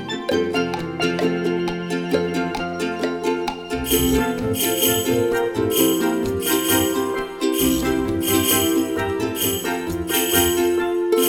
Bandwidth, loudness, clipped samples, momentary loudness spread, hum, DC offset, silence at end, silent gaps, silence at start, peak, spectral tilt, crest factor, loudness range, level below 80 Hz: 19 kHz; -20 LUFS; under 0.1%; 7 LU; none; under 0.1%; 0 s; none; 0 s; -2 dBFS; -3.5 dB/octave; 18 dB; 3 LU; -40 dBFS